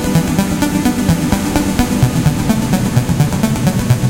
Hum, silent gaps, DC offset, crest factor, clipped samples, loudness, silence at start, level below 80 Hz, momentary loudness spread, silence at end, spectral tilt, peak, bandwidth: none; none; under 0.1%; 14 dB; under 0.1%; -14 LUFS; 0 s; -28 dBFS; 2 LU; 0 s; -6 dB/octave; 0 dBFS; 17.5 kHz